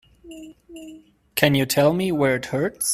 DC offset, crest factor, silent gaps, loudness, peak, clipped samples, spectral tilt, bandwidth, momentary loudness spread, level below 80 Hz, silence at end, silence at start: under 0.1%; 22 dB; none; -20 LUFS; 0 dBFS; under 0.1%; -4.5 dB/octave; 16 kHz; 23 LU; -56 dBFS; 0 s; 0.25 s